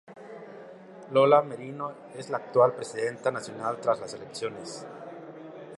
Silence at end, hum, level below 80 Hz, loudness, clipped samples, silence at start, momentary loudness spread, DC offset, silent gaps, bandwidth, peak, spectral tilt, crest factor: 0 s; none; -76 dBFS; -27 LUFS; under 0.1%; 0.1 s; 22 LU; under 0.1%; none; 11.5 kHz; -6 dBFS; -5 dB/octave; 22 dB